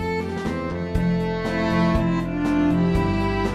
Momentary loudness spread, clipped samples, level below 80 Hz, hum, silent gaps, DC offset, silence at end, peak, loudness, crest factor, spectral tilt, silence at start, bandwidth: 7 LU; under 0.1%; -34 dBFS; none; none; under 0.1%; 0 s; -8 dBFS; -22 LUFS; 14 dB; -7.5 dB/octave; 0 s; 10.5 kHz